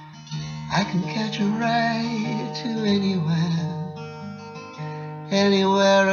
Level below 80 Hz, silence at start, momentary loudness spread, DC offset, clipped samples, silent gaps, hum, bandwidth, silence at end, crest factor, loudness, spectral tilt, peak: -58 dBFS; 0 s; 17 LU; under 0.1%; under 0.1%; none; none; 7.2 kHz; 0 s; 14 dB; -23 LUFS; -5.5 dB/octave; -8 dBFS